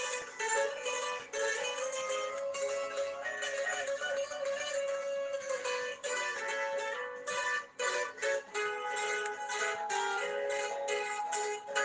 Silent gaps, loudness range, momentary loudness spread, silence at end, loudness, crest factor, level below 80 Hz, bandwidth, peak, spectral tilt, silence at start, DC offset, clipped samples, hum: none; 1 LU; 3 LU; 0 s; -35 LUFS; 18 dB; -84 dBFS; 10 kHz; -18 dBFS; 0.5 dB/octave; 0 s; under 0.1%; under 0.1%; none